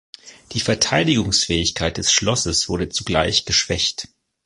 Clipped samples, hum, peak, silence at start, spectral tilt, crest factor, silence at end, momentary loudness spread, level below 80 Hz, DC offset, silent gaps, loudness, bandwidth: under 0.1%; none; -2 dBFS; 0.25 s; -3 dB/octave; 20 dB; 0.4 s; 7 LU; -38 dBFS; under 0.1%; none; -18 LUFS; 11.5 kHz